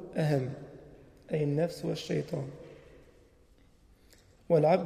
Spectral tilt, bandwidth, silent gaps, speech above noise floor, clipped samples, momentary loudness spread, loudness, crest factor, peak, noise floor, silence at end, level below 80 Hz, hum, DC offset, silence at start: -7.5 dB/octave; 14.5 kHz; none; 32 dB; under 0.1%; 22 LU; -32 LUFS; 20 dB; -12 dBFS; -61 dBFS; 0 s; -62 dBFS; none; under 0.1%; 0 s